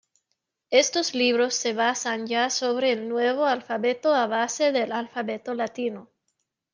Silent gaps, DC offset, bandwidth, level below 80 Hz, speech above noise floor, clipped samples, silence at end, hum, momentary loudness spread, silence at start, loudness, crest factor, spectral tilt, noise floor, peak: none; under 0.1%; 10 kHz; -80 dBFS; 55 dB; under 0.1%; 0.7 s; none; 9 LU; 0.7 s; -24 LUFS; 20 dB; -2 dB/octave; -79 dBFS; -6 dBFS